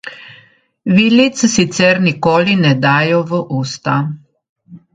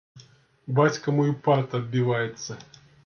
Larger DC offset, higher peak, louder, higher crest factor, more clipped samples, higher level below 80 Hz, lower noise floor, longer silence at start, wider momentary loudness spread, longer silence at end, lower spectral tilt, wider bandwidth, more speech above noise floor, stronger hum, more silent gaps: neither; first, 0 dBFS vs -8 dBFS; first, -13 LUFS vs -24 LUFS; about the same, 14 dB vs 18 dB; neither; first, -52 dBFS vs -66 dBFS; second, -49 dBFS vs -53 dBFS; about the same, 0.05 s vs 0.15 s; second, 11 LU vs 15 LU; second, 0.15 s vs 0.4 s; second, -5 dB/octave vs -6.5 dB/octave; first, 9.4 kHz vs 6.8 kHz; first, 36 dB vs 29 dB; neither; first, 4.49-4.56 s vs none